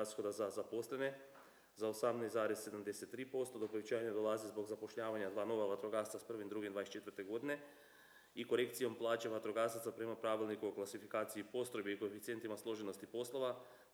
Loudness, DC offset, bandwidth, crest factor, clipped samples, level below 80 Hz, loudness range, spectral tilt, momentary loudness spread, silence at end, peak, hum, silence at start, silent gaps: -43 LUFS; under 0.1%; over 20 kHz; 20 dB; under 0.1%; under -90 dBFS; 2 LU; -4.5 dB/octave; 8 LU; 0.1 s; -24 dBFS; none; 0 s; none